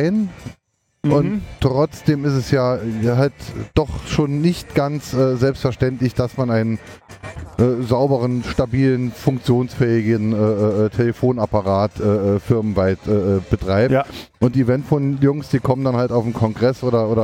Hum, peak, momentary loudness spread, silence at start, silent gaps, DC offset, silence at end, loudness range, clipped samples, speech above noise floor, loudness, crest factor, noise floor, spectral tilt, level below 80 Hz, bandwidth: none; -2 dBFS; 4 LU; 0 s; none; under 0.1%; 0 s; 2 LU; under 0.1%; 46 dB; -19 LUFS; 16 dB; -64 dBFS; -8 dB/octave; -40 dBFS; 16 kHz